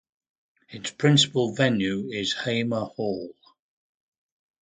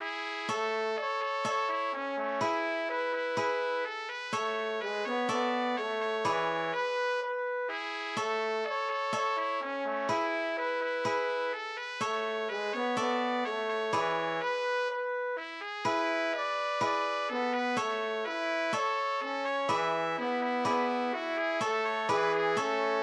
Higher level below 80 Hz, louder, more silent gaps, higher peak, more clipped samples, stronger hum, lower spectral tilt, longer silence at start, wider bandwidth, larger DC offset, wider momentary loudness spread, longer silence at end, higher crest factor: first, -62 dBFS vs -84 dBFS; first, -24 LUFS vs -31 LUFS; neither; first, -6 dBFS vs -16 dBFS; neither; neither; about the same, -4.5 dB/octave vs -3.5 dB/octave; first, 0.7 s vs 0 s; second, 9.6 kHz vs 11.5 kHz; neither; first, 16 LU vs 4 LU; first, 1.3 s vs 0 s; first, 22 dB vs 16 dB